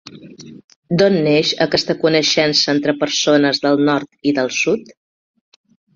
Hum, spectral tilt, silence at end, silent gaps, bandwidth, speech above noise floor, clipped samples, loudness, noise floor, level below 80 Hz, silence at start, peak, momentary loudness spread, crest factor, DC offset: none; -4 dB/octave; 1.15 s; 0.64-0.68 s, 0.76-0.82 s; 7.4 kHz; 22 dB; under 0.1%; -15 LUFS; -38 dBFS; -56 dBFS; 0.15 s; -2 dBFS; 5 LU; 16 dB; under 0.1%